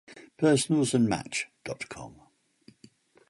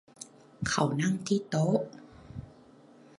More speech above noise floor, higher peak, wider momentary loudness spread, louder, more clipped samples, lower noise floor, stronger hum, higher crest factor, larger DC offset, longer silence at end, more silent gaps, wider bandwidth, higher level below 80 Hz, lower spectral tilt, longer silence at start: first, 33 dB vs 27 dB; about the same, -12 dBFS vs -12 dBFS; second, 16 LU vs 20 LU; about the same, -27 LUFS vs -29 LUFS; neither; first, -60 dBFS vs -56 dBFS; neither; about the same, 18 dB vs 20 dB; neither; first, 1.2 s vs 0.7 s; neither; about the same, 11.5 kHz vs 11.5 kHz; about the same, -62 dBFS vs -58 dBFS; about the same, -5 dB/octave vs -5.5 dB/octave; about the same, 0.1 s vs 0.2 s